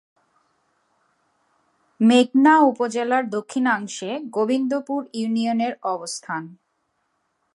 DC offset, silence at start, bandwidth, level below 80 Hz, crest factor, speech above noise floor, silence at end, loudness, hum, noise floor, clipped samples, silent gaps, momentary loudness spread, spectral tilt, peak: under 0.1%; 2 s; 11.5 kHz; -80 dBFS; 18 dB; 51 dB; 1 s; -21 LUFS; none; -72 dBFS; under 0.1%; none; 14 LU; -4.5 dB/octave; -4 dBFS